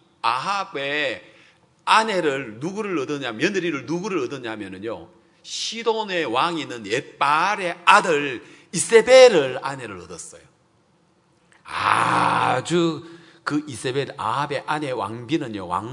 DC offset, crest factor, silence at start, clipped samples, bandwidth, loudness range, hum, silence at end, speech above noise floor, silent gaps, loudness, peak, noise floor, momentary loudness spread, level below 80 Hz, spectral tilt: under 0.1%; 22 dB; 0.25 s; under 0.1%; 11 kHz; 9 LU; none; 0 s; 40 dB; none; -21 LUFS; 0 dBFS; -61 dBFS; 17 LU; -66 dBFS; -4 dB/octave